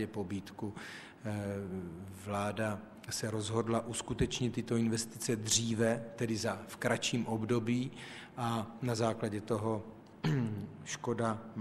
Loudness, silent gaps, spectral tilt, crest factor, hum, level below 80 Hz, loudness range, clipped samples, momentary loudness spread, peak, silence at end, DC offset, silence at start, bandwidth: -36 LUFS; none; -4.5 dB/octave; 22 dB; none; -60 dBFS; 4 LU; under 0.1%; 11 LU; -14 dBFS; 0 s; under 0.1%; 0 s; 14.5 kHz